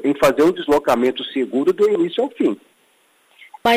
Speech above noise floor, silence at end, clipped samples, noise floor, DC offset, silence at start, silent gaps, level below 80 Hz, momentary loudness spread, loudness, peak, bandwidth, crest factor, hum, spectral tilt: 41 dB; 0 s; under 0.1%; -58 dBFS; under 0.1%; 0 s; none; -52 dBFS; 7 LU; -18 LUFS; -4 dBFS; 15.5 kHz; 14 dB; none; -5 dB/octave